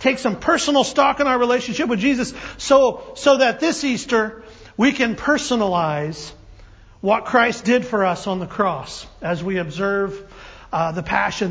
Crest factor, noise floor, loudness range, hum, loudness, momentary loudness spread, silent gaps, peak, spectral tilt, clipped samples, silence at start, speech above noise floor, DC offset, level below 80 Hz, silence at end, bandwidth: 18 dB; -45 dBFS; 5 LU; none; -19 LUFS; 11 LU; none; -2 dBFS; -4.5 dB/octave; under 0.1%; 0 s; 26 dB; under 0.1%; -48 dBFS; 0 s; 8 kHz